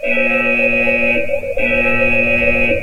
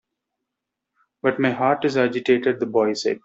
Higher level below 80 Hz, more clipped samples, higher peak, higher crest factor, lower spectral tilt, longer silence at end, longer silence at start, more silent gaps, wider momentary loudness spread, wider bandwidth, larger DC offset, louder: first, -32 dBFS vs -66 dBFS; neither; about the same, -2 dBFS vs -4 dBFS; second, 12 dB vs 18 dB; about the same, -6 dB/octave vs -5.5 dB/octave; about the same, 0 s vs 0.05 s; second, 0 s vs 1.25 s; neither; about the same, 4 LU vs 3 LU; first, 15.5 kHz vs 7.8 kHz; first, 7% vs under 0.1%; first, -13 LUFS vs -21 LUFS